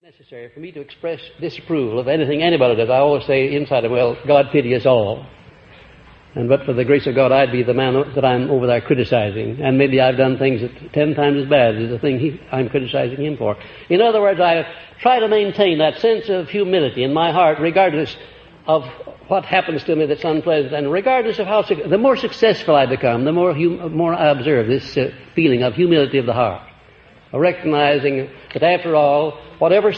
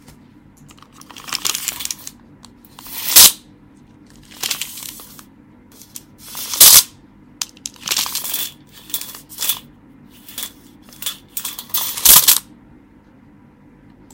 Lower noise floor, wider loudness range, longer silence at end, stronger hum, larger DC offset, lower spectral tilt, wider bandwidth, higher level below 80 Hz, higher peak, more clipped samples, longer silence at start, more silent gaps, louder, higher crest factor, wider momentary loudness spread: about the same, -47 dBFS vs -47 dBFS; second, 2 LU vs 12 LU; second, 0 s vs 1.75 s; neither; neither; first, -8 dB/octave vs 1.5 dB/octave; second, 6.6 kHz vs 19 kHz; about the same, -52 dBFS vs -50 dBFS; about the same, 0 dBFS vs 0 dBFS; second, under 0.1% vs 0.3%; second, 0.3 s vs 1.25 s; neither; second, -17 LUFS vs -12 LUFS; about the same, 16 dB vs 20 dB; second, 9 LU vs 24 LU